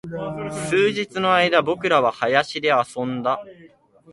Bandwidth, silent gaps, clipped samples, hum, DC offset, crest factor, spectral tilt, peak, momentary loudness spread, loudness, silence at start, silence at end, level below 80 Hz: 11.5 kHz; none; under 0.1%; none; under 0.1%; 20 dB; -4.5 dB/octave; -2 dBFS; 11 LU; -20 LUFS; 0.05 s; 0.45 s; -60 dBFS